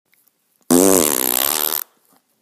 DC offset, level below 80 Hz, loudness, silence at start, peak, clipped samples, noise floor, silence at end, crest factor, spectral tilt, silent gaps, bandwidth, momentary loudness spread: under 0.1%; -54 dBFS; -15 LUFS; 0.7 s; 0 dBFS; under 0.1%; -61 dBFS; 0.6 s; 18 dB; -2.5 dB/octave; none; over 20 kHz; 10 LU